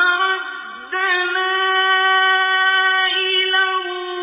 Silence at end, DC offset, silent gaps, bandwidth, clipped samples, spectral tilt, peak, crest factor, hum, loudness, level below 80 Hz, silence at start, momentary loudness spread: 0 s; under 0.1%; none; 3.9 kHz; under 0.1%; -2 dB/octave; -4 dBFS; 14 dB; none; -16 LUFS; -76 dBFS; 0 s; 10 LU